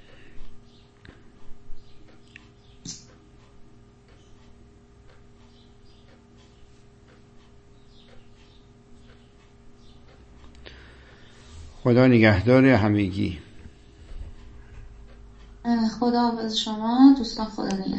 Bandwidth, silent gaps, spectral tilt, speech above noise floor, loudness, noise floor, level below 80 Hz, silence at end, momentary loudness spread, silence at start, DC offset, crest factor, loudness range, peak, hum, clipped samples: 8.2 kHz; none; -6.5 dB/octave; 33 dB; -21 LUFS; -52 dBFS; -48 dBFS; 0 s; 28 LU; 0.2 s; under 0.1%; 22 dB; 25 LU; -4 dBFS; none; under 0.1%